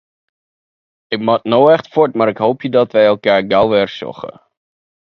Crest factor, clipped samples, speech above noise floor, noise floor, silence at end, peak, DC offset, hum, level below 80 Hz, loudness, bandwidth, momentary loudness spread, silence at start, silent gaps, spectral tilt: 16 dB; under 0.1%; over 77 dB; under -90 dBFS; 0.75 s; 0 dBFS; under 0.1%; none; -56 dBFS; -14 LUFS; 6.4 kHz; 14 LU; 1.1 s; none; -7.5 dB/octave